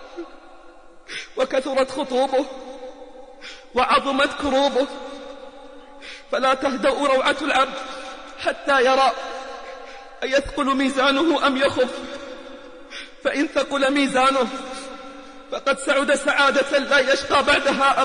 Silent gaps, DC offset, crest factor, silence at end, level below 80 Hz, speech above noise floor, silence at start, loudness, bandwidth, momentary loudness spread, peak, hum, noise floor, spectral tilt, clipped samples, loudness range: none; 0.3%; 16 dB; 0 s; -50 dBFS; 25 dB; 0 s; -20 LUFS; 10 kHz; 21 LU; -6 dBFS; none; -45 dBFS; -2.5 dB/octave; under 0.1%; 3 LU